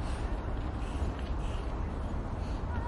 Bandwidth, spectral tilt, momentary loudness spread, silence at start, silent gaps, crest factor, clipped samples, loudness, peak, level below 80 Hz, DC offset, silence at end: 11.5 kHz; -7 dB/octave; 1 LU; 0 s; none; 12 dB; under 0.1%; -37 LUFS; -22 dBFS; -36 dBFS; under 0.1%; 0 s